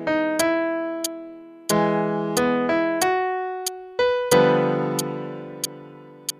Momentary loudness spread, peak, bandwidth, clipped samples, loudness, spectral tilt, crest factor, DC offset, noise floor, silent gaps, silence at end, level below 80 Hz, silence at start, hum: 14 LU; -4 dBFS; 15.5 kHz; under 0.1%; -23 LUFS; -4 dB/octave; 20 dB; under 0.1%; -43 dBFS; none; 0.1 s; -60 dBFS; 0 s; none